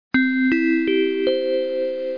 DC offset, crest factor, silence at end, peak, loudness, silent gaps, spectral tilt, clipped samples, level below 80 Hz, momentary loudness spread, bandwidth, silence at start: 0.3%; 10 dB; 0 s; -10 dBFS; -20 LUFS; none; -6.5 dB/octave; under 0.1%; -58 dBFS; 5 LU; 5.2 kHz; 0.15 s